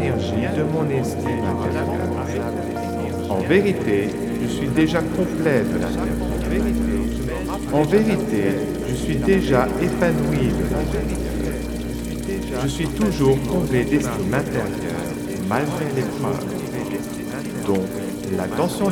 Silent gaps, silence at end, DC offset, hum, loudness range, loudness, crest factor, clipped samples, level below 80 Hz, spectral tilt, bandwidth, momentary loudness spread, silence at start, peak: none; 0 s; under 0.1%; none; 4 LU; -22 LUFS; 20 dB; under 0.1%; -34 dBFS; -6.5 dB/octave; 19.5 kHz; 8 LU; 0 s; -2 dBFS